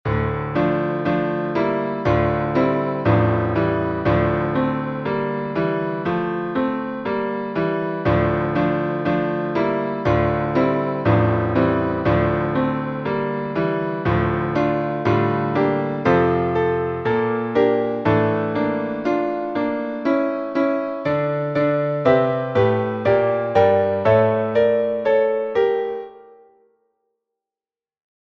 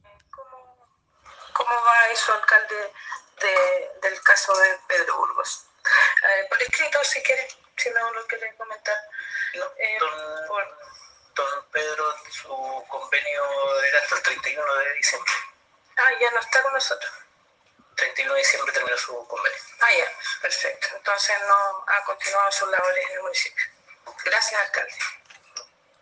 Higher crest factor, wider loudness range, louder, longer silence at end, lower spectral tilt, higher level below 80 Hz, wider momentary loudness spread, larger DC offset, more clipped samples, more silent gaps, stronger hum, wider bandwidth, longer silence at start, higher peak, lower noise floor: second, 16 dB vs 22 dB; second, 4 LU vs 8 LU; about the same, -20 LUFS vs -22 LUFS; first, 2 s vs 0.4 s; first, -9 dB/octave vs 1.5 dB/octave; first, -42 dBFS vs -72 dBFS; second, 6 LU vs 14 LU; neither; neither; neither; neither; second, 6.2 kHz vs 10 kHz; second, 0.05 s vs 0.35 s; about the same, -2 dBFS vs -2 dBFS; first, under -90 dBFS vs -62 dBFS